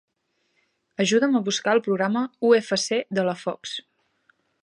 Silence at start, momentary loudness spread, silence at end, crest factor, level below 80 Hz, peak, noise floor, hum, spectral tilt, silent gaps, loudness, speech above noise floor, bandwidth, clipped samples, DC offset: 1 s; 13 LU; 0.8 s; 18 dB; -76 dBFS; -6 dBFS; -73 dBFS; none; -4 dB/octave; none; -23 LUFS; 50 dB; 11.5 kHz; under 0.1%; under 0.1%